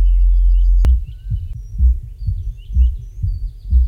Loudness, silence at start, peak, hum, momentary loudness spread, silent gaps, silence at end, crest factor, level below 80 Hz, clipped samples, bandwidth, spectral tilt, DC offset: -19 LUFS; 0 s; -4 dBFS; none; 10 LU; none; 0 s; 10 dB; -14 dBFS; under 0.1%; 3 kHz; -8.5 dB/octave; under 0.1%